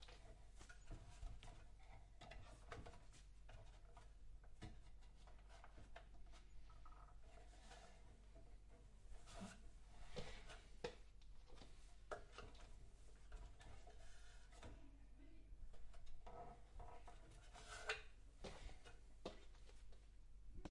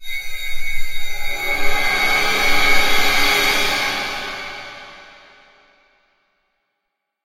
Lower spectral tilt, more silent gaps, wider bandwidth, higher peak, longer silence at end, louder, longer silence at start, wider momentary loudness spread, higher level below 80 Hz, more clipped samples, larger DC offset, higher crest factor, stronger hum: first, -4 dB/octave vs -1 dB/octave; neither; second, 11 kHz vs 16 kHz; second, -32 dBFS vs 0 dBFS; second, 0 s vs 2.25 s; second, -62 LUFS vs -18 LUFS; about the same, 0 s vs 0 s; second, 11 LU vs 15 LU; second, -62 dBFS vs -30 dBFS; neither; neither; first, 24 dB vs 16 dB; neither